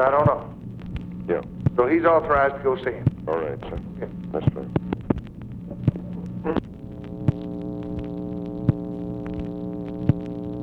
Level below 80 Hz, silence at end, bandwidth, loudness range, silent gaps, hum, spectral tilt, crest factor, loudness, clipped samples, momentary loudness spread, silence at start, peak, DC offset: -42 dBFS; 0 s; 5.6 kHz; 6 LU; none; none; -10 dB/octave; 20 dB; -25 LUFS; under 0.1%; 15 LU; 0 s; -4 dBFS; under 0.1%